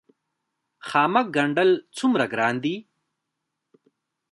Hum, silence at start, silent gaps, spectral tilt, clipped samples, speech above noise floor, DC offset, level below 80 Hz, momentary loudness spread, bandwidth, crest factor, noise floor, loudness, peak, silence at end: none; 0.85 s; none; -5.5 dB/octave; under 0.1%; 59 dB; under 0.1%; -74 dBFS; 9 LU; 11.5 kHz; 20 dB; -81 dBFS; -22 LUFS; -4 dBFS; 1.5 s